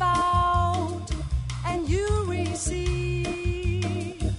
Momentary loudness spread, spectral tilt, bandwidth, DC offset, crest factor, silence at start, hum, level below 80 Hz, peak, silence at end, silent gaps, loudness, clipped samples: 8 LU; -5.5 dB/octave; 11 kHz; under 0.1%; 14 dB; 0 s; none; -32 dBFS; -12 dBFS; 0 s; none; -26 LUFS; under 0.1%